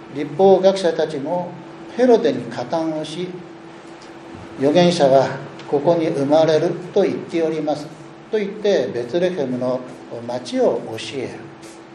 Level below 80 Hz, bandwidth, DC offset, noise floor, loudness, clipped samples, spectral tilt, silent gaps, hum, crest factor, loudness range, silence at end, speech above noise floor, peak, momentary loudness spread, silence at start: -64 dBFS; 11 kHz; under 0.1%; -38 dBFS; -19 LUFS; under 0.1%; -6 dB/octave; none; none; 18 dB; 5 LU; 0 s; 20 dB; -2 dBFS; 21 LU; 0 s